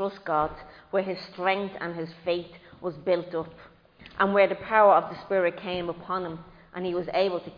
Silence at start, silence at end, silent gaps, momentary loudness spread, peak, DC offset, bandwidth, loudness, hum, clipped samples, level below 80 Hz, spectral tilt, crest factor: 0 s; 0.05 s; none; 16 LU; -8 dBFS; under 0.1%; 5.2 kHz; -27 LUFS; none; under 0.1%; -58 dBFS; -7.5 dB/octave; 20 dB